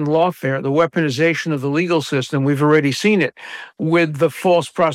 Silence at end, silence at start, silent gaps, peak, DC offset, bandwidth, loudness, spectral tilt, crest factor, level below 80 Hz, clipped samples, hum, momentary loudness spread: 0 s; 0 s; none; -4 dBFS; under 0.1%; 15.5 kHz; -17 LUFS; -6 dB/octave; 12 dB; -66 dBFS; under 0.1%; none; 6 LU